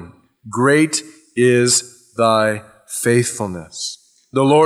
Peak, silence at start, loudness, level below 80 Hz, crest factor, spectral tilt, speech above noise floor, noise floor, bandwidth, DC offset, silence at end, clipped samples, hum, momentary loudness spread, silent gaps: -2 dBFS; 0 s; -17 LUFS; -60 dBFS; 14 dB; -4 dB/octave; 24 dB; -39 dBFS; 15.5 kHz; under 0.1%; 0 s; under 0.1%; none; 14 LU; none